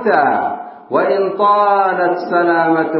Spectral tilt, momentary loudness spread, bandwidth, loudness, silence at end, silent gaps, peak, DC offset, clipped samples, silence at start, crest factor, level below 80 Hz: -10.5 dB/octave; 7 LU; 5.8 kHz; -14 LUFS; 0 s; none; 0 dBFS; under 0.1%; under 0.1%; 0 s; 14 dB; -70 dBFS